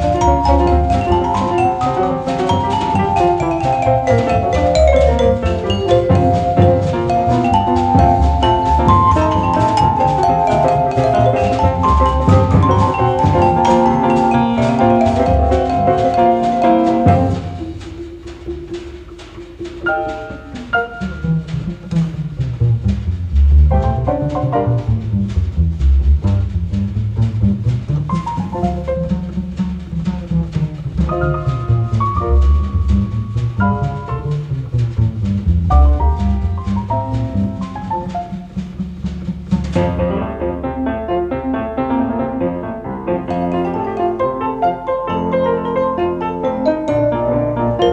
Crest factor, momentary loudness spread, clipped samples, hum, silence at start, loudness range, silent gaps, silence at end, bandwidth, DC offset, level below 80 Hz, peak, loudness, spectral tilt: 14 dB; 10 LU; under 0.1%; none; 0 s; 8 LU; none; 0 s; 8.8 kHz; under 0.1%; -22 dBFS; 0 dBFS; -16 LUFS; -8 dB/octave